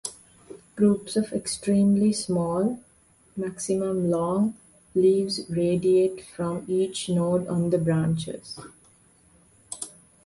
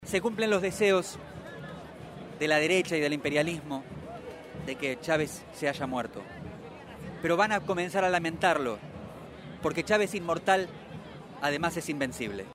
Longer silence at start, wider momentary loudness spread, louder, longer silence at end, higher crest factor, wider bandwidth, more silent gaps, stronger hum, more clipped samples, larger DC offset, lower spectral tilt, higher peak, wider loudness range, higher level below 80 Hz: about the same, 0.05 s vs 0 s; second, 15 LU vs 18 LU; first, -25 LUFS vs -29 LUFS; first, 0.4 s vs 0 s; about the same, 16 dB vs 20 dB; second, 11.5 kHz vs 16 kHz; neither; neither; neither; neither; first, -6.5 dB/octave vs -4.5 dB/octave; about the same, -10 dBFS vs -10 dBFS; about the same, 3 LU vs 4 LU; about the same, -58 dBFS vs -58 dBFS